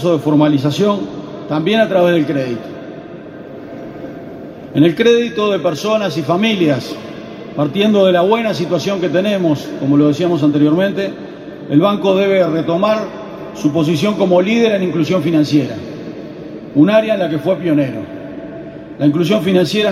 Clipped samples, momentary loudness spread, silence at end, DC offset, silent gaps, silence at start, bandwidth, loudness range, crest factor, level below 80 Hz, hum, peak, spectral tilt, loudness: under 0.1%; 18 LU; 0 s; under 0.1%; none; 0 s; 15 kHz; 3 LU; 14 dB; -54 dBFS; none; 0 dBFS; -6.5 dB/octave; -14 LUFS